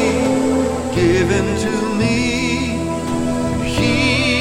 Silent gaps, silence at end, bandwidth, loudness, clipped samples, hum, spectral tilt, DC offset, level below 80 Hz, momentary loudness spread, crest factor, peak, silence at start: none; 0 s; 15.5 kHz; -17 LUFS; under 0.1%; none; -5 dB/octave; under 0.1%; -32 dBFS; 5 LU; 14 dB; -2 dBFS; 0 s